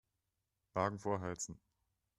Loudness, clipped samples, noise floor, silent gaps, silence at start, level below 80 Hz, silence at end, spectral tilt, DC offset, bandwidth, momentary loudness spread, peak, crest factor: -41 LUFS; under 0.1%; -87 dBFS; none; 0.75 s; -72 dBFS; 0.65 s; -5 dB/octave; under 0.1%; 12 kHz; 8 LU; -18 dBFS; 24 dB